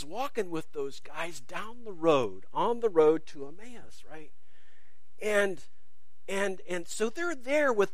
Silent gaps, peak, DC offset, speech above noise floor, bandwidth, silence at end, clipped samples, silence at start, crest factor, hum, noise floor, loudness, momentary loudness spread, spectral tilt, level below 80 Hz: none; -10 dBFS; 2%; 41 dB; 15.5 kHz; 0.05 s; under 0.1%; 0 s; 20 dB; none; -71 dBFS; -30 LUFS; 22 LU; -4.5 dB/octave; -68 dBFS